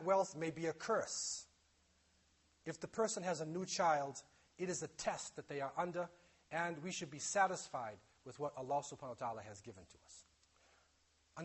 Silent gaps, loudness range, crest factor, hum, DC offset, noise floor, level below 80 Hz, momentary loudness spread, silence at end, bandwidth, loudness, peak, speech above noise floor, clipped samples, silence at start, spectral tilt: none; 6 LU; 22 dB; none; under 0.1%; -76 dBFS; -78 dBFS; 19 LU; 0 s; 8.4 kHz; -41 LUFS; -22 dBFS; 34 dB; under 0.1%; 0 s; -3.5 dB/octave